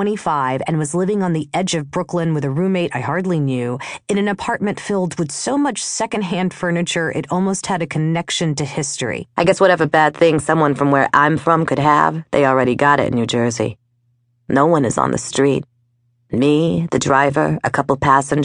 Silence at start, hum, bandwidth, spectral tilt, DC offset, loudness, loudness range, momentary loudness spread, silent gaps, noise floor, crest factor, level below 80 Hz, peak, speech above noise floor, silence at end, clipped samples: 0 s; none; 10.5 kHz; -5 dB/octave; under 0.1%; -17 LUFS; 5 LU; 7 LU; none; -62 dBFS; 16 dB; -50 dBFS; 0 dBFS; 46 dB; 0 s; under 0.1%